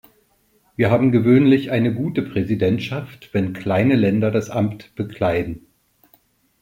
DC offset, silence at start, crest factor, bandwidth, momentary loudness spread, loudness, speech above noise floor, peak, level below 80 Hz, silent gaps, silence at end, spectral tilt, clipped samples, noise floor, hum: under 0.1%; 0.8 s; 16 dB; 16 kHz; 15 LU; -19 LUFS; 43 dB; -4 dBFS; -52 dBFS; none; 1.05 s; -8 dB/octave; under 0.1%; -61 dBFS; none